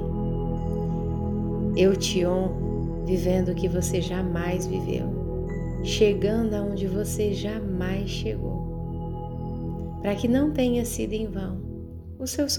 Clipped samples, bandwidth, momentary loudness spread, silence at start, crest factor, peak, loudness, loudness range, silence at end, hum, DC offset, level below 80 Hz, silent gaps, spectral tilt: under 0.1%; 18 kHz; 11 LU; 0 s; 18 dB; -8 dBFS; -27 LUFS; 4 LU; 0 s; none; under 0.1%; -36 dBFS; none; -6 dB/octave